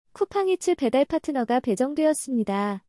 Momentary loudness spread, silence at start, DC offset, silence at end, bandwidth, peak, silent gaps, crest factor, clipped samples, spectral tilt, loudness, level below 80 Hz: 4 LU; 0.15 s; under 0.1%; 0.1 s; 12 kHz; -10 dBFS; none; 14 dB; under 0.1%; -5 dB/octave; -24 LUFS; -60 dBFS